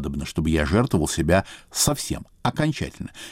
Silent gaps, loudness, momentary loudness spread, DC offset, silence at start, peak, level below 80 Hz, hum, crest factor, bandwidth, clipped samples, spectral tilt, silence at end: none; -23 LUFS; 10 LU; under 0.1%; 0 s; -8 dBFS; -36 dBFS; none; 16 dB; 16 kHz; under 0.1%; -4.5 dB/octave; 0 s